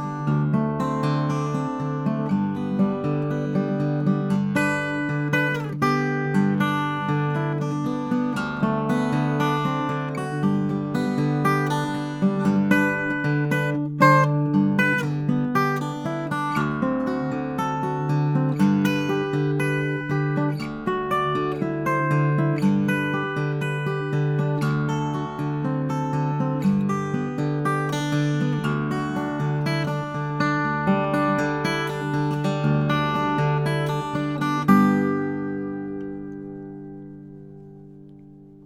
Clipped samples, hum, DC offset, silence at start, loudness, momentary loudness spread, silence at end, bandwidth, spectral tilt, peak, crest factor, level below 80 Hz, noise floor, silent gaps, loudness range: under 0.1%; none; under 0.1%; 0 s; -23 LUFS; 6 LU; 0 s; 14.5 kHz; -7.5 dB/octave; -2 dBFS; 20 dB; -56 dBFS; -45 dBFS; none; 4 LU